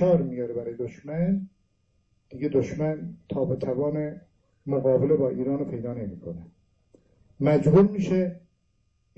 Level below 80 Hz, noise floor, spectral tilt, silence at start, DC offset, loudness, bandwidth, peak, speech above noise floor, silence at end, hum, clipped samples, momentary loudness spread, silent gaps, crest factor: -56 dBFS; -70 dBFS; -9.5 dB/octave; 0 s; under 0.1%; -26 LUFS; 7.8 kHz; -6 dBFS; 45 dB; 0.8 s; none; under 0.1%; 16 LU; none; 20 dB